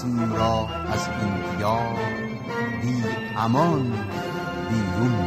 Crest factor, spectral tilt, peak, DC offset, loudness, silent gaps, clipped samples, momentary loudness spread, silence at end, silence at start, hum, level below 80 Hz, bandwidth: 16 dB; -6.5 dB/octave; -8 dBFS; under 0.1%; -25 LUFS; none; under 0.1%; 7 LU; 0 s; 0 s; none; -48 dBFS; 15.5 kHz